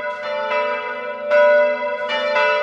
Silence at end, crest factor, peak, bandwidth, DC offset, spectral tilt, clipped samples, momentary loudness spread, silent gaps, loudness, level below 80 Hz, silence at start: 0 s; 14 dB; -4 dBFS; 7.4 kHz; under 0.1%; -2.5 dB/octave; under 0.1%; 10 LU; none; -18 LUFS; -70 dBFS; 0 s